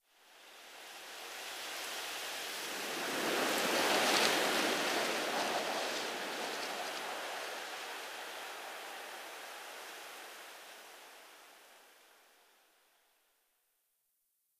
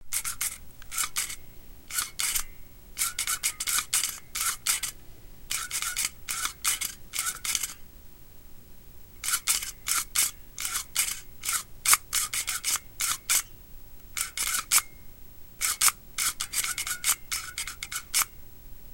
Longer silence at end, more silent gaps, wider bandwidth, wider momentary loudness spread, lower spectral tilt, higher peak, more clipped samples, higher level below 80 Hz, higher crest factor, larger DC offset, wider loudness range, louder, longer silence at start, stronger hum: first, 2.65 s vs 0 s; neither; about the same, 15.5 kHz vs 17 kHz; first, 21 LU vs 11 LU; first, -1 dB/octave vs 2 dB/octave; second, -14 dBFS vs 0 dBFS; neither; second, -84 dBFS vs -50 dBFS; about the same, 26 dB vs 30 dB; neither; first, 18 LU vs 4 LU; second, -36 LUFS vs -27 LUFS; first, 0.25 s vs 0 s; neither